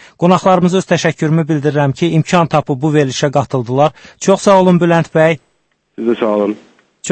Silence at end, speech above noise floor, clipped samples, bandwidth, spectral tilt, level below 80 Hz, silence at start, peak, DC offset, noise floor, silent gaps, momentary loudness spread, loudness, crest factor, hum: 0 s; 50 dB; under 0.1%; 8.8 kHz; -6 dB/octave; -52 dBFS; 0.2 s; 0 dBFS; under 0.1%; -62 dBFS; none; 8 LU; -13 LUFS; 12 dB; none